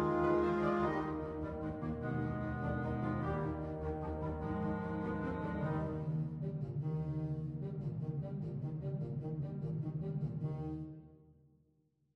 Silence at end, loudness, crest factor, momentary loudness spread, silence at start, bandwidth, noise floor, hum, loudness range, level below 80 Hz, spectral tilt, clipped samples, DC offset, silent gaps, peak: 0.85 s; -39 LUFS; 16 dB; 7 LU; 0 s; 6 kHz; -76 dBFS; none; 4 LU; -54 dBFS; -10 dB/octave; under 0.1%; under 0.1%; none; -22 dBFS